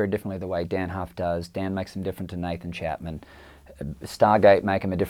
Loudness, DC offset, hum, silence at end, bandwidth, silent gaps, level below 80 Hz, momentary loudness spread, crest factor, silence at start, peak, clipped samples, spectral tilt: -25 LUFS; under 0.1%; none; 0 s; 16 kHz; none; -52 dBFS; 18 LU; 22 dB; 0 s; -4 dBFS; under 0.1%; -7 dB/octave